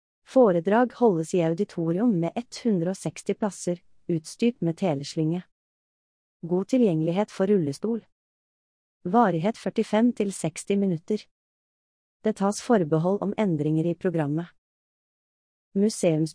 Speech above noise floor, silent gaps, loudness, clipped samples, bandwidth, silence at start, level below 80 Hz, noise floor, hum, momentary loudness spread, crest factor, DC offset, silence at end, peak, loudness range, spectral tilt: over 66 dB; 5.52-6.40 s, 8.12-9.00 s, 11.31-12.20 s, 14.58-15.71 s; -25 LUFS; under 0.1%; 10.5 kHz; 0.3 s; -70 dBFS; under -90 dBFS; none; 9 LU; 18 dB; under 0.1%; 0.05 s; -8 dBFS; 3 LU; -6.5 dB/octave